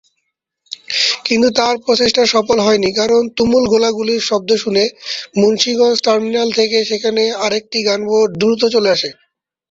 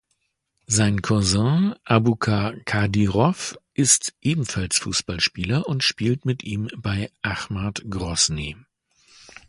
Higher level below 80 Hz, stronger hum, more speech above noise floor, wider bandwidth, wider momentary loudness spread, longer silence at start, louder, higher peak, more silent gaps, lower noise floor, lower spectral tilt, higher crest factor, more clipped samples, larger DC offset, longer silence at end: second, -52 dBFS vs -44 dBFS; neither; first, 58 dB vs 51 dB; second, 7.8 kHz vs 11.5 kHz; second, 5 LU vs 9 LU; about the same, 0.7 s vs 0.7 s; first, -14 LUFS vs -22 LUFS; about the same, 0 dBFS vs 0 dBFS; neither; about the same, -72 dBFS vs -73 dBFS; about the same, -3.5 dB/octave vs -4 dB/octave; second, 14 dB vs 22 dB; neither; neither; second, 0.6 s vs 0.95 s